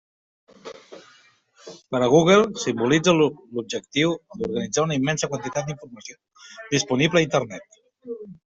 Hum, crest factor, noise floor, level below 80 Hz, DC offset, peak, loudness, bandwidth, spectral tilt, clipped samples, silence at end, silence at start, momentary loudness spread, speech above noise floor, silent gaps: none; 20 dB; -57 dBFS; -60 dBFS; under 0.1%; -4 dBFS; -22 LUFS; 8 kHz; -4.5 dB/octave; under 0.1%; 0.15 s; 0.65 s; 23 LU; 34 dB; none